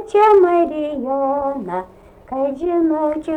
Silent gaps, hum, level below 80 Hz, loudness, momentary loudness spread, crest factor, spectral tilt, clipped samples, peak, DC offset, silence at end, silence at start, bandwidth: none; none; -50 dBFS; -17 LUFS; 14 LU; 12 dB; -7 dB/octave; under 0.1%; -4 dBFS; under 0.1%; 0 s; 0 s; 9.2 kHz